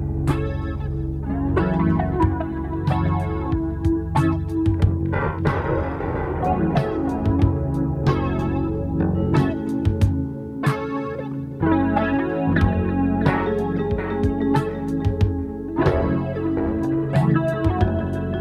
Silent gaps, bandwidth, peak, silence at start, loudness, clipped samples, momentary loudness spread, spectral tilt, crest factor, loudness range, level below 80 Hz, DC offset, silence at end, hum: none; 11.5 kHz; -4 dBFS; 0 s; -22 LUFS; under 0.1%; 6 LU; -9 dB/octave; 18 dB; 1 LU; -32 dBFS; under 0.1%; 0 s; none